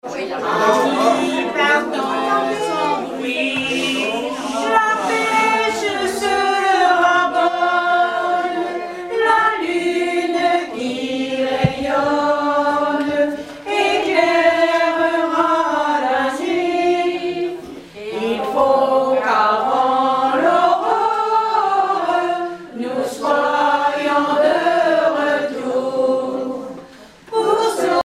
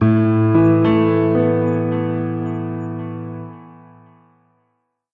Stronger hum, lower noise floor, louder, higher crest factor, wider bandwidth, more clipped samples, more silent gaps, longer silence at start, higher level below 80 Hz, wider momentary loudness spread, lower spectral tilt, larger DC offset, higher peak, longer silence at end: neither; second, -41 dBFS vs -69 dBFS; about the same, -17 LUFS vs -17 LUFS; about the same, 16 dB vs 14 dB; first, 15.5 kHz vs 4.4 kHz; neither; neither; about the same, 0.05 s vs 0 s; about the same, -54 dBFS vs -52 dBFS; second, 8 LU vs 16 LU; second, -4 dB/octave vs -11 dB/octave; neither; about the same, -2 dBFS vs -4 dBFS; second, 0 s vs 1.4 s